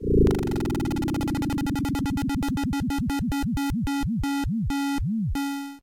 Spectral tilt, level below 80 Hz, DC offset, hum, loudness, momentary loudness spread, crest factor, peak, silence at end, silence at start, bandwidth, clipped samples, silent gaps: -6.5 dB/octave; -34 dBFS; under 0.1%; none; -26 LUFS; 2 LU; 14 dB; -12 dBFS; 0.05 s; 0 s; 17 kHz; under 0.1%; none